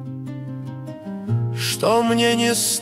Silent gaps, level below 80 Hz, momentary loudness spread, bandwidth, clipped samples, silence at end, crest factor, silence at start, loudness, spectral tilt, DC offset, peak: none; -60 dBFS; 15 LU; 16 kHz; under 0.1%; 0 s; 16 dB; 0 s; -19 LUFS; -4 dB/octave; under 0.1%; -6 dBFS